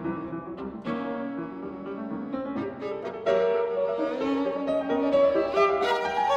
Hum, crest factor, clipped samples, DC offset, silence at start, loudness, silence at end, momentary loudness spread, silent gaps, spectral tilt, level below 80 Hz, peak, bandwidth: none; 16 dB; under 0.1%; under 0.1%; 0 s; -27 LUFS; 0 s; 13 LU; none; -6 dB/octave; -60 dBFS; -10 dBFS; 9.4 kHz